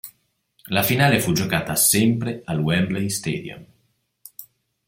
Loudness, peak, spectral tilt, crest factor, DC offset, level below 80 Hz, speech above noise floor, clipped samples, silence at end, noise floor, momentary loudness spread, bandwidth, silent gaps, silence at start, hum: -20 LUFS; -2 dBFS; -4 dB/octave; 20 dB; under 0.1%; -54 dBFS; 47 dB; under 0.1%; 0.45 s; -68 dBFS; 24 LU; 17 kHz; none; 0.05 s; none